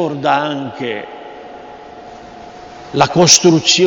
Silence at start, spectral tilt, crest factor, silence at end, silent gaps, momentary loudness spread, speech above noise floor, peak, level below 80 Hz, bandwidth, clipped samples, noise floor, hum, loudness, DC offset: 0 s; -3 dB/octave; 16 dB; 0 s; none; 27 LU; 21 dB; 0 dBFS; -52 dBFS; 11 kHz; under 0.1%; -34 dBFS; none; -12 LUFS; under 0.1%